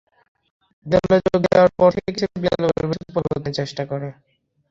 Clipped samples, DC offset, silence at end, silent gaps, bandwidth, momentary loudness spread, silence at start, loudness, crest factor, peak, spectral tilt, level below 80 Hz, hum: under 0.1%; under 0.1%; 0.6 s; none; 7.6 kHz; 11 LU; 0.85 s; -20 LUFS; 18 dB; -2 dBFS; -7 dB/octave; -46 dBFS; none